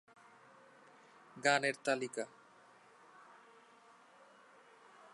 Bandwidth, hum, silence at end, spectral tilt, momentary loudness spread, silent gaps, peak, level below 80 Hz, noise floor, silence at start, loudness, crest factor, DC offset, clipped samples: 11.5 kHz; none; 0.05 s; -3 dB/octave; 29 LU; none; -16 dBFS; under -90 dBFS; -63 dBFS; 1.35 s; -36 LUFS; 26 dB; under 0.1%; under 0.1%